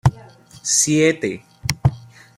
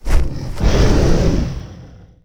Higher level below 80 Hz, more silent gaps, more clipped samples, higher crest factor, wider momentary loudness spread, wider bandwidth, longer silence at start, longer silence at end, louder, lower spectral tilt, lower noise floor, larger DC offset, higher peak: second, -42 dBFS vs -18 dBFS; neither; neither; first, 20 dB vs 14 dB; about the same, 12 LU vs 13 LU; first, 16 kHz vs 12 kHz; about the same, 0.05 s vs 0.05 s; about the same, 0.4 s vs 0.4 s; about the same, -19 LUFS vs -18 LUFS; second, -4 dB/octave vs -6.5 dB/octave; first, -44 dBFS vs -39 dBFS; neither; about the same, 0 dBFS vs 0 dBFS